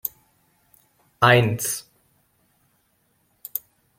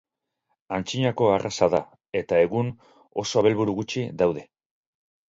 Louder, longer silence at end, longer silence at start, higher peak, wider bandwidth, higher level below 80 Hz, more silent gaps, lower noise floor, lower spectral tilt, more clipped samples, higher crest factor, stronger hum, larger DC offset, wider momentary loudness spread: first, -21 LUFS vs -24 LUFS; second, 0.4 s vs 0.85 s; second, 0.05 s vs 0.7 s; first, -2 dBFS vs -6 dBFS; first, 16.5 kHz vs 7.8 kHz; about the same, -60 dBFS vs -58 dBFS; neither; second, -67 dBFS vs -77 dBFS; second, -4 dB/octave vs -5.5 dB/octave; neither; about the same, 24 dB vs 20 dB; neither; neither; first, 16 LU vs 10 LU